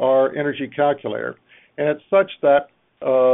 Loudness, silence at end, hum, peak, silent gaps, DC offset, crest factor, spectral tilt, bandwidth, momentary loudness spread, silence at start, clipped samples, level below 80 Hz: -20 LUFS; 0 s; none; -4 dBFS; none; under 0.1%; 16 dB; -4 dB/octave; 3.9 kHz; 11 LU; 0 s; under 0.1%; -64 dBFS